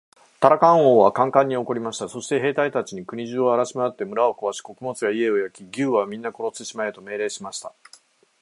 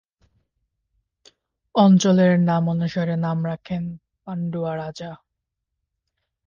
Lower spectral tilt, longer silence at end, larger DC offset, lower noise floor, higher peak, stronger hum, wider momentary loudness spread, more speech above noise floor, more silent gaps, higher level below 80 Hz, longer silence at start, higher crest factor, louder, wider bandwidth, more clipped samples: second, -5 dB/octave vs -7 dB/octave; second, 0.7 s vs 1.3 s; neither; second, -54 dBFS vs -81 dBFS; first, 0 dBFS vs -6 dBFS; neither; about the same, 16 LU vs 18 LU; second, 33 dB vs 61 dB; neither; second, -70 dBFS vs -60 dBFS; second, 0.4 s vs 1.75 s; first, 22 dB vs 16 dB; about the same, -22 LUFS vs -20 LUFS; first, 11.5 kHz vs 7.2 kHz; neither